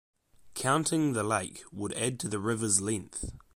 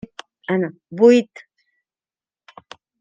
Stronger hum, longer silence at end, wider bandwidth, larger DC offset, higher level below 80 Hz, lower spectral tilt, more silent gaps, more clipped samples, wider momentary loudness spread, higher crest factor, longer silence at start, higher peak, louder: neither; second, 0.15 s vs 1.8 s; first, 16 kHz vs 7.6 kHz; neither; first, -54 dBFS vs -68 dBFS; second, -4 dB/octave vs -6.5 dB/octave; neither; neither; second, 13 LU vs 22 LU; about the same, 20 dB vs 20 dB; about the same, 0.45 s vs 0.5 s; second, -12 dBFS vs -2 dBFS; second, -30 LUFS vs -17 LUFS